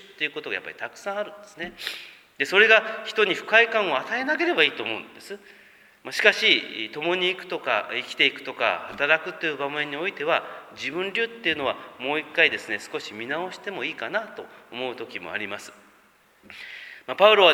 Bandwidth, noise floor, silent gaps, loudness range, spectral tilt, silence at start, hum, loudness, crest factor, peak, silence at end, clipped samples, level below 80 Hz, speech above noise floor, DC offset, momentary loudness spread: 19 kHz; -58 dBFS; none; 11 LU; -3 dB/octave; 0.05 s; none; -23 LUFS; 26 dB; 0 dBFS; 0 s; under 0.1%; -72 dBFS; 34 dB; under 0.1%; 18 LU